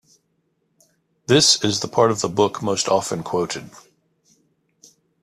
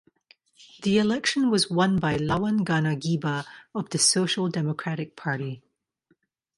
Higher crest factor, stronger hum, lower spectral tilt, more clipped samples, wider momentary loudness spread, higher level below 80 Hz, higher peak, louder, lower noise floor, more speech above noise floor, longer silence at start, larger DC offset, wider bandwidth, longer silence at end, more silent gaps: about the same, 22 dB vs 18 dB; neither; about the same, -3.5 dB/octave vs -4 dB/octave; neither; about the same, 12 LU vs 11 LU; about the same, -60 dBFS vs -58 dBFS; first, -2 dBFS vs -8 dBFS; first, -19 LUFS vs -25 LUFS; about the same, -69 dBFS vs -69 dBFS; first, 50 dB vs 45 dB; first, 1.3 s vs 0.6 s; neither; first, 14.5 kHz vs 11.5 kHz; first, 1.45 s vs 1 s; neither